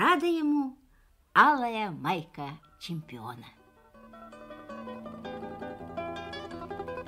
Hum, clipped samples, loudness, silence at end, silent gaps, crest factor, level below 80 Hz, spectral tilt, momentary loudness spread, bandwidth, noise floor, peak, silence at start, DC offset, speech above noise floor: none; under 0.1%; -30 LUFS; 0 s; none; 24 dB; -62 dBFS; -5.5 dB/octave; 22 LU; 15.5 kHz; -63 dBFS; -8 dBFS; 0 s; under 0.1%; 35 dB